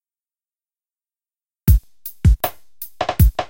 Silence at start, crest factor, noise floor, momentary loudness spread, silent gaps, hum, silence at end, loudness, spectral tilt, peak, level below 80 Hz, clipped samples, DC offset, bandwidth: 1.65 s; 18 dB; under -90 dBFS; 17 LU; none; none; 0.05 s; -19 LUFS; -6.5 dB/octave; -2 dBFS; -22 dBFS; under 0.1%; under 0.1%; 17 kHz